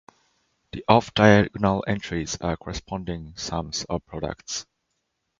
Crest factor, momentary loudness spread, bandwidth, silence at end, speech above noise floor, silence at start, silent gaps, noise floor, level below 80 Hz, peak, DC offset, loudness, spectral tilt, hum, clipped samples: 24 dB; 16 LU; 7.6 kHz; 0.75 s; 53 dB; 0.75 s; none; -77 dBFS; -46 dBFS; 0 dBFS; under 0.1%; -24 LUFS; -5 dB/octave; none; under 0.1%